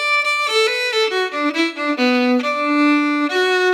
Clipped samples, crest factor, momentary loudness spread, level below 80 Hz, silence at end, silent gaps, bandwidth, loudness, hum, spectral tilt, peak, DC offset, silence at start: under 0.1%; 12 dB; 4 LU; -88 dBFS; 0 s; none; 15.5 kHz; -17 LUFS; none; -1.5 dB/octave; -6 dBFS; under 0.1%; 0 s